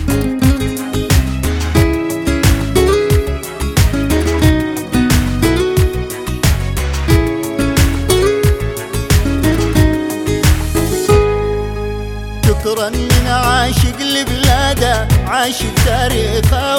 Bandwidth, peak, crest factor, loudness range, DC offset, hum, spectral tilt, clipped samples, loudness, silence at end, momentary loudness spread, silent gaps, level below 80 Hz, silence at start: 19.5 kHz; 0 dBFS; 12 dB; 1 LU; under 0.1%; none; -5 dB/octave; under 0.1%; -14 LUFS; 0 s; 6 LU; none; -20 dBFS; 0 s